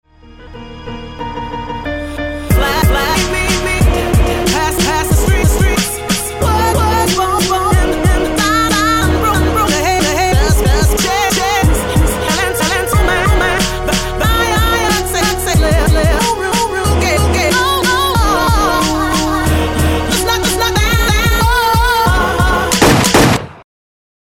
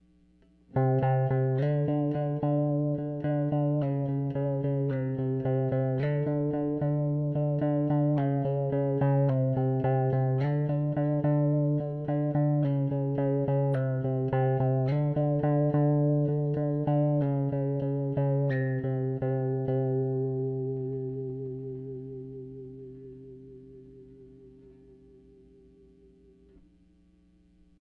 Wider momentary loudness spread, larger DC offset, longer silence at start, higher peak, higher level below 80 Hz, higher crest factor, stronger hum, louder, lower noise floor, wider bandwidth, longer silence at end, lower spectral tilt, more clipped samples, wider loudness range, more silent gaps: second, 5 LU vs 10 LU; neither; second, 0.4 s vs 0.75 s; first, 0 dBFS vs -14 dBFS; first, -18 dBFS vs -60 dBFS; about the same, 12 dB vs 14 dB; neither; first, -12 LUFS vs -28 LUFS; second, -36 dBFS vs -62 dBFS; first, 18 kHz vs 3.4 kHz; second, 0.75 s vs 3.35 s; second, -4 dB/octave vs -12.5 dB/octave; neither; second, 2 LU vs 9 LU; neither